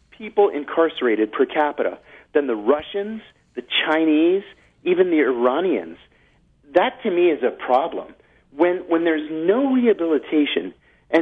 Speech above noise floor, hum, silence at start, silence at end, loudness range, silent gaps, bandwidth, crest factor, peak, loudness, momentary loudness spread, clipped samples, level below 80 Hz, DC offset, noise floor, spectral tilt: 38 dB; none; 0.2 s; 0 s; 2 LU; none; 4.8 kHz; 18 dB; -2 dBFS; -20 LUFS; 10 LU; under 0.1%; -62 dBFS; under 0.1%; -58 dBFS; -7 dB/octave